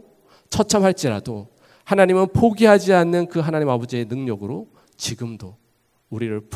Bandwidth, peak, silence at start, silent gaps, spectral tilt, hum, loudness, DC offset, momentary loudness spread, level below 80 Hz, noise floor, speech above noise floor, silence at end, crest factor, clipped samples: 15.5 kHz; 0 dBFS; 0.5 s; none; -5.5 dB/octave; none; -19 LUFS; under 0.1%; 18 LU; -48 dBFS; -64 dBFS; 45 dB; 0 s; 20 dB; under 0.1%